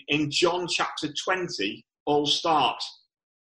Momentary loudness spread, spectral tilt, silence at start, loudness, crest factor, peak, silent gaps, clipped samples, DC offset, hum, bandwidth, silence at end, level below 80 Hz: 10 LU; -3 dB/octave; 0.1 s; -25 LUFS; 16 dB; -10 dBFS; 2.00-2.06 s; under 0.1%; under 0.1%; none; 11.5 kHz; 0.55 s; -64 dBFS